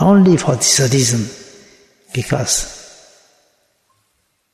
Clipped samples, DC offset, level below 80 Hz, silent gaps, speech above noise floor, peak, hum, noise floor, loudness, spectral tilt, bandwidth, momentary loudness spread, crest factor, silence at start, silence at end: under 0.1%; under 0.1%; -44 dBFS; none; 51 dB; -2 dBFS; none; -65 dBFS; -14 LUFS; -4.5 dB/octave; 14 kHz; 18 LU; 16 dB; 0 s; 1.7 s